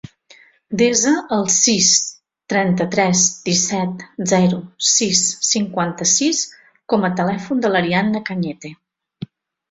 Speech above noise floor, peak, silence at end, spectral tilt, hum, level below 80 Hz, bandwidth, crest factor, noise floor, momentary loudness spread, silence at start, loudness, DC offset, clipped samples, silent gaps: 32 dB; 0 dBFS; 0.45 s; -3 dB/octave; none; -58 dBFS; 8 kHz; 18 dB; -50 dBFS; 14 LU; 0.7 s; -16 LUFS; under 0.1%; under 0.1%; none